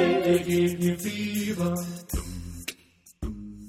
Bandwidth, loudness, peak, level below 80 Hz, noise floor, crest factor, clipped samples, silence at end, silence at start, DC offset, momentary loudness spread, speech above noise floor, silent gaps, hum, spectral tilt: 16.5 kHz; -27 LUFS; -10 dBFS; -42 dBFS; -56 dBFS; 16 dB; under 0.1%; 0 s; 0 s; under 0.1%; 15 LU; 30 dB; none; none; -5.5 dB/octave